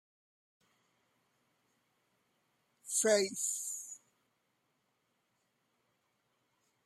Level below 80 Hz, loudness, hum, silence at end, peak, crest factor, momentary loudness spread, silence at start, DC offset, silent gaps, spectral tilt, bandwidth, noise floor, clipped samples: under -90 dBFS; -33 LUFS; none; 2.9 s; -16 dBFS; 26 dB; 18 LU; 2.85 s; under 0.1%; none; -1.5 dB/octave; 15 kHz; -80 dBFS; under 0.1%